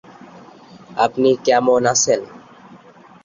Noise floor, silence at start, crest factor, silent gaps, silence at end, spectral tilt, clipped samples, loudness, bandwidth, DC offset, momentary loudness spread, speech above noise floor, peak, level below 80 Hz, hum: -45 dBFS; 0.9 s; 18 dB; none; 0.5 s; -3 dB/octave; under 0.1%; -16 LUFS; 7.6 kHz; under 0.1%; 11 LU; 29 dB; -2 dBFS; -60 dBFS; none